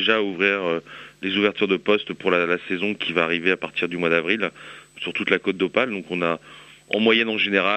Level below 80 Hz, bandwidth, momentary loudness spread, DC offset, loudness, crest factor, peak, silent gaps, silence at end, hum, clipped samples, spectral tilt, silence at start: -66 dBFS; 8.4 kHz; 10 LU; under 0.1%; -22 LUFS; 20 dB; -2 dBFS; none; 0 s; none; under 0.1%; -5.5 dB/octave; 0 s